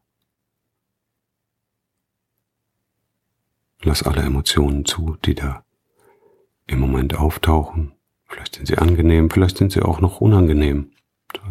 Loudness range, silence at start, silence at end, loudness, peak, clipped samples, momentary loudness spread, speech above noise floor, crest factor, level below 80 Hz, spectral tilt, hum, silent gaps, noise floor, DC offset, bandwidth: 6 LU; 3.8 s; 0 s; -18 LUFS; -2 dBFS; under 0.1%; 17 LU; 62 dB; 18 dB; -26 dBFS; -6 dB/octave; none; none; -78 dBFS; under 0.1%; 16 kHz